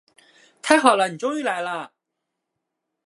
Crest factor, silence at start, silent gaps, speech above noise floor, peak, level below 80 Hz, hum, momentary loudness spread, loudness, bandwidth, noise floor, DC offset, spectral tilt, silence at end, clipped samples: 24 dB; 0.65 s; none; 61 dB; 0 dBFS; -72 dBFS; none; 17 LU; -20 LUFS; 11.5 kHz; -81 dBFS; under 0.1%; -3 dB/octave; 1.2 s; under 0.1%